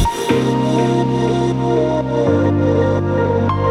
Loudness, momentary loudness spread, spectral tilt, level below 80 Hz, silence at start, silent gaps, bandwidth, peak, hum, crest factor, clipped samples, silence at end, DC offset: -16 LUFS; 2 LU; -7 dB/octave; -34 dBFS; 0 s; none; 13.5 kHz; -2 dBFS; none; 14 dB; under 0.1%; 0 s; under 0.1%